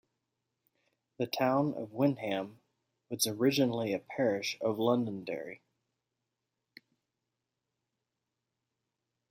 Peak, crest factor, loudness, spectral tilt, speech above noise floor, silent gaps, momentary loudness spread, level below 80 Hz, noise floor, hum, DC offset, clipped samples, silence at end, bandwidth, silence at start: -16 dBFS; 20 dB; -32 LUFS; -4.5 dB/octave; 55 dB; none; 12 LU; -80 dBFS; -87 dBFS; none; under 0.1%; under 0.1%; 3.75 s; 16.5 kHz; 1.2 s